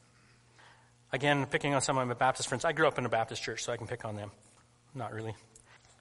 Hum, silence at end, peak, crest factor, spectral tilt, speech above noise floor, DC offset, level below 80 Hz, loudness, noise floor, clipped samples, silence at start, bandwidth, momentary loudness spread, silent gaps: none; 0.65 s; -10 dBFS; 24 dB; -4 dB/octave; 31 dB; under 0.1%; -64 dBFS; -32 LUFS; -63 dBFS; under 0.1%; 0.65 s; 11.5 kHz; 15 LU; none